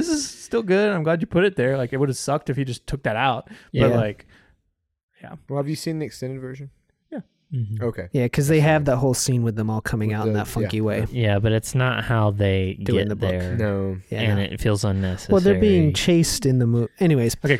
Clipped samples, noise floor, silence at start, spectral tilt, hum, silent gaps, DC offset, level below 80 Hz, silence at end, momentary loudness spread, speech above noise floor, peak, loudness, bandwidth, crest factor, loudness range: under 0.1%; -73 dBFS; 0 s; -6 dB/octave; none; 5.03-5.08 s; under 0.1%; -44 dBFS; 0 s; 11 LU; 52 dB; -4 dBFS; -22 LUFS; 16.5 kHz; 16 dB; 8 LU